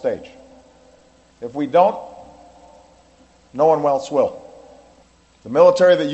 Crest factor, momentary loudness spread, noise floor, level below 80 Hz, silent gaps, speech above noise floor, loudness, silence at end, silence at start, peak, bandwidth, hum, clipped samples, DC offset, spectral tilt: 20 dB; 22 LU; -53 dBFS; -60 dBFS; none; 37 dB; -17 LUFS; 0 s; 0.05 s; 0 dBFS; 8.4 kHz; none; under 0.1%; under 0.1%; -5.5 dB/octave